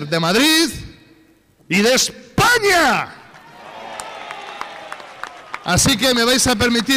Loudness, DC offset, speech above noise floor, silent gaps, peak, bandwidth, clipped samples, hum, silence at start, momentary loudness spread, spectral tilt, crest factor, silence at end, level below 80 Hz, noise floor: -15 LUFS; under 0.1%; 37 dB; none; -6 dBFS; 16 kHz; under 0.1%; none; 0 s; 20 LU; -3 dB/octave; 12 dB; 0 s; -42 dBFS; -53 dBFS